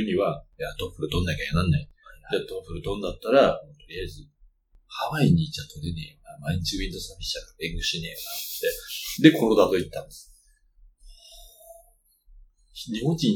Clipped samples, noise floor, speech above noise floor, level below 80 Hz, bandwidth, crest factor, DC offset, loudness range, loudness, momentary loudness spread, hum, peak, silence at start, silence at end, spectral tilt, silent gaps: under 0.1%; -60 dBFS; 34 dB; -44 dBFS; 19 kHz; 26 dB; under 0.1%; 6 LU; -26 LUFS; 17 LU; none; -2 dBFS; 0 s; 0 s; -5.5 dB/octave; none